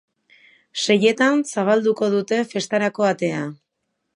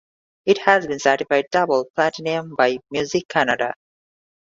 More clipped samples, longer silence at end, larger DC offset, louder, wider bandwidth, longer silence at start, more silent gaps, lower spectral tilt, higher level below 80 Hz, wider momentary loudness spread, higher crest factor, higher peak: neither; second, 0.6 s vs 0.8 s; neither; about the same, -20 LUFS vs -20 LUFS; first, 11.5 kHz vs 7.8 kHz; first, 0.75 s vs 0.45 s; second, none vs 1.90-1.94 s, 3.25-3.29 s; about the same, -4.5 dB/octave vs -4 dB/octave; second, -72 dBFS vs -62 dBFS; about the same, 8 LU vs 8 LU; about the same, 18 dB vs 20 dB; second, -4 dBFS vs 0 dBFS